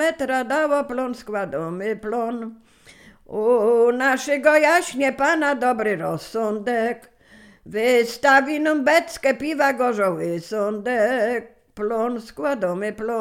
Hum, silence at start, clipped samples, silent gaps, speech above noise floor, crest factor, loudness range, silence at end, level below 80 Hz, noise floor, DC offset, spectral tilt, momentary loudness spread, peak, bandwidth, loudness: none; 0 s; under 0.1%; none; 29 dB; 18 dB; 5 LU; 0 s; -58 dBFS; -50 dBFS; under 0.1%; -4.5 dB/octave; 11 LU; -4 dBFS; 16 kHz; -21 LUFS